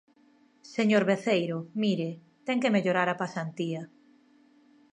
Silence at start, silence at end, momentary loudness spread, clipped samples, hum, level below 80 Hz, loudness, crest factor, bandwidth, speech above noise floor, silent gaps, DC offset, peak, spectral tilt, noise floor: 0.65 s; 1.05 s; 13 LU; under 0.1%; none; -80 dBFS; -28 LUFS; 18 dB; 9.4 kHz; 35 dB; none; under 0.1%; -10 dBFS; -6 dB/octave; -62 dBFS